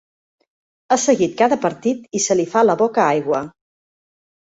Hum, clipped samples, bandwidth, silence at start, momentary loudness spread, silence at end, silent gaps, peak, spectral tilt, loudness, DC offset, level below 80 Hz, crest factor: none; under 0.1%; 8 kHz; 0.9 s; 7 LU; 0.9 s; none; -2 dBFS; -4 dB/octave; -18 LUFS; under 0.1%; -62 dBFS; 18 dB